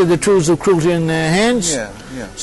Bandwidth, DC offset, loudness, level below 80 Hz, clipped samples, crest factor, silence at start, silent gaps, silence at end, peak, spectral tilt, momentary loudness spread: 12 kHz; under 0.1%; -15 LUFS; -40 dBFS; under 0.1%; 10 dB; 0 s; none; 0 s; -6 dBFS; -5 dB/octave; 14 LU